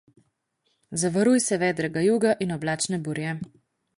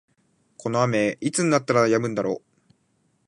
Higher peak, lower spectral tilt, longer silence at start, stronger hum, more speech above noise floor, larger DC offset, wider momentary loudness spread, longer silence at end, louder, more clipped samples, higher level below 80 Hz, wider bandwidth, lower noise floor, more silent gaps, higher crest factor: about the same, -8 dBFS vs -6 dBFS; about the same, -4.5 dB/octave vs -5 dB/octave; first, 0.9 s vs 0.6 s; neither; first, 50 dB vs 46 dB; neither; about the same, 11 LU vs 9 LU; second, 0.5 s vs 0.9 s; about the same, -24 LUFS vs -23 LUFS; neither; about the same, -62 dBFS vs -66 dBFS; about the same, 11.5 kHz vs 11.5 kHz; first, -74 dBFS vs -68 dBFS; neither; about the same, 16 dB vs 18 dB